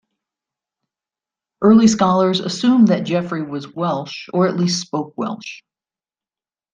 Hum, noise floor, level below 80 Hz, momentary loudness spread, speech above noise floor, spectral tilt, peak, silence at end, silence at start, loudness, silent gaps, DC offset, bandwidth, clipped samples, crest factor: none; under -90 dBFS; -60 dBFS; 14 LU; over 73 dB; -5.5 dB/octave; -2 dBFS; 1.15 s; 1.6 s; -17 LUFS; none; under 0.1%; 9.2 kHz; under 0.1%; 16 dB